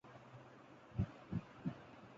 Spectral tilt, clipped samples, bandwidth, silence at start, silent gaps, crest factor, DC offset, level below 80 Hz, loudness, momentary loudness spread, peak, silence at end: -8 dB/octave; under 0.1%; 7.6 kHz; 0.05 s; none; 22 dB; under 0.1%; -60 dBFS; -47 LUFS; 15 LU; -26 dBFS; 0 s